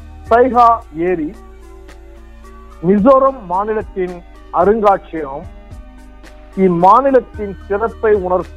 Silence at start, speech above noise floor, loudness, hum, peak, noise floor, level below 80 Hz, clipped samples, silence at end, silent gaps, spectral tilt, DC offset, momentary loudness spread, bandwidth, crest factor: 0 s; 23 dB; -14 LUFS; none; 0 dBFS; -37 dBFS; -36 dBFS; 0.2%; 0 s; none; -8.5 dB/octave; under 0.1%; 17 LU; 9.6 kHz; 14 dB